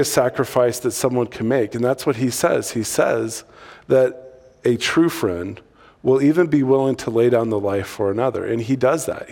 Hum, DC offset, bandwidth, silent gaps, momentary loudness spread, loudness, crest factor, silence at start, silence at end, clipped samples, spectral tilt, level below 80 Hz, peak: none; under 0.1%; 18 kHz; none; 7 LU; -19 LUFS; 16 dB; 0 s; 0 s; under 0.1%; -5 dB/octave; -56 dBFS; -2 dBFS